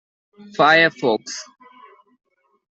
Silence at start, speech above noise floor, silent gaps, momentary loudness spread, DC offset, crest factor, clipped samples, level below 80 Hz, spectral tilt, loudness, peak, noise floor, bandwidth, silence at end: 0.6 s; 31 dB; none; 19 LU; under 0.1%; 20 dB; under 0.1%; -70 dBFS; -3.5 dB/octave; -16 LUFS; -2 dBFS; -49 dBFS; 8.2 kHz; 1.35 s